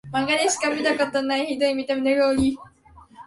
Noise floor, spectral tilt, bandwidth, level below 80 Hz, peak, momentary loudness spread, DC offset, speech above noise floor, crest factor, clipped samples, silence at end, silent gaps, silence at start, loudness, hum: -47 dBFS; -3 dB/octave; 11.5 kHz; -50 dBFS; -8 dBFS; 4 LU; under 0.1%; 25 dB; 16 dB; under 0.1%; 0.05 s; none; 0.05 s; -22 LUFS; none